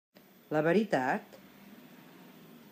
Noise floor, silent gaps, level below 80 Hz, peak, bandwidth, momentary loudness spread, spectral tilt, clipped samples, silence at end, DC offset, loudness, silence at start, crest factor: -54 dBFS; none; -82 dBFS; -14 dBFS; 15.5 kHz; 26 LU; -6.5 dB/octave; under 0.1%; 1 s; under 0.1%; -30 LUFS; 0.5 s; 20 dB